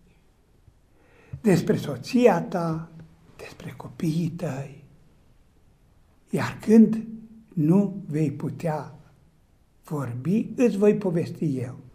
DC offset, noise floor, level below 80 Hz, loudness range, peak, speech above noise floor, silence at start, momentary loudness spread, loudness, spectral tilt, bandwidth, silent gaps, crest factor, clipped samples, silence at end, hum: under 0.1%; -60 dBFS; -60 dBFS; 9 LU; -4 dBFS; 37 dB; 1.35 s; 20 LU; -24 LUFS; -7.5 dB/octave; 15 kHz; none; 22 dB; under 0.1%; 0.15 s; none